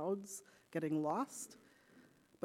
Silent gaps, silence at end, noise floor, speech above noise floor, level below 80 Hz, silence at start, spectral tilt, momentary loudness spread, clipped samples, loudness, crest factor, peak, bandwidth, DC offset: none; 0.45 s; -66 dBFS; 25 dB; -88 dBFS; 0 s; -5.5 dB/octave; 14 LU; under 0.1%; -42 LUFS; 16 dB; -26 dBFS; 16 kHz; under 0.1%